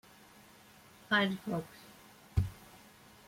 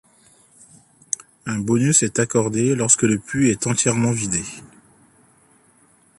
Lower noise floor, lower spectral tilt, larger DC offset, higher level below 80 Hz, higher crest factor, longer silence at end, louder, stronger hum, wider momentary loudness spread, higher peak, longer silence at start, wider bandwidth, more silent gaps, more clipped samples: about the same, -59 dBFS vs -56 dBFS; about the same, -5.5 dB/octave vs -4.5 dB/octave; neither; about the same, -52 dBFS vs -54 dBFS; about the same, 22 dB vs 20 dB; second, 0.5 s vs 1.55 s; second, -34 LUFS vs -19 LUFS; neither; first, 27 LU vs 13 LU; second, -16 dBFS vs -2 dBFS; second, 1.1 s vs 1.45 s; first, 16.5 kHz vs 11.5 kHz; neither; neither